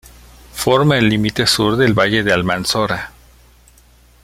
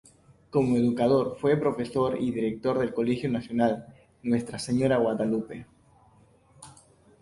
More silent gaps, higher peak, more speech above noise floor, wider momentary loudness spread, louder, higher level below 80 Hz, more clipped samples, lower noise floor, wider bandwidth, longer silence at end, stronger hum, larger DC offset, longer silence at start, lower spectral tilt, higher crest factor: neither; first, 0 dBFS vs -10 dBFS; about the same, 34 dB vs 34 dB; first, 9 LU vs 6 LU; first, -15 LUFS vs -27 LUFS; first, -42 dBFS vs -60 dBFS; neither; second, -48 dBFS vs -59 dBFS; first, 16.5 kHz vs 11.5 kHz; first, 1.15 s vs 0.5 s; neither; neither; about the same, 0.55 s vs 0.55 s; second, -4.5 dB/octave vs -7 dB/octave; about the same, 16 dB vs 16 dB